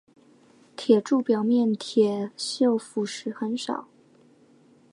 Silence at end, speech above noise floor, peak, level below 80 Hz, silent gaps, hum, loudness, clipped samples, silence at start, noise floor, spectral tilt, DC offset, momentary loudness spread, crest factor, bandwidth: 1.1 s; 33 dB; -6 dBFS; -82 dBFS; none; none; -25 LUFS; under 0.1%; 0.8 s; -57 dBFS; -5 dB/octave; under 0.1%; 11 LU; 20 dB; 11 kHz